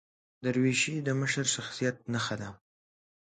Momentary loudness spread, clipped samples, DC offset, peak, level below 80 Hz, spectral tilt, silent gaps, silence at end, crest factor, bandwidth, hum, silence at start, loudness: 9 LU; under 0.1%; under 0.1%; -14 dBFS; -68 dBFS; -4 dB/octave; none; 0.65 s; 18 dB; 9.6 kHz; none; 0.4 s; -30 LUFS